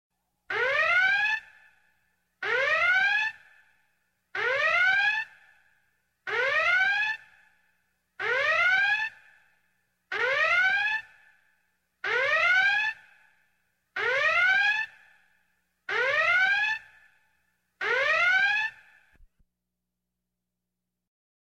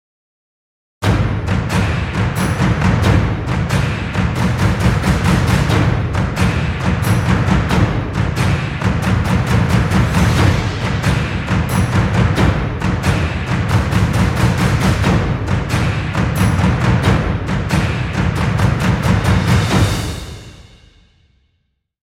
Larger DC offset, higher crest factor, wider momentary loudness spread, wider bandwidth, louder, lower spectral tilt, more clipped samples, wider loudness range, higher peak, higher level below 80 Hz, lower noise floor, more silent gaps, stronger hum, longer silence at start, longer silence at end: neither; about the same, 14 dB vs 14 dB; first, 12 LU vs 5 LU; second, 13 kHz vs 15.5 kHz; second, -24 LUFS vs -16 LUFS; second, -1 dB/octave vs -6 dB/octave; neither; about the same, 3 LU vs 1 LU; second, -14 dBFS vs 0 dBFS; second, -72 dBFS vs -24 dBFS; first, -86 dBFS vs -66 dBFS; neither; first, 60 Hz at -75 dBFS vs none; second, 0.5 s vs 1 s; first, 2.7 s vs 1.45 s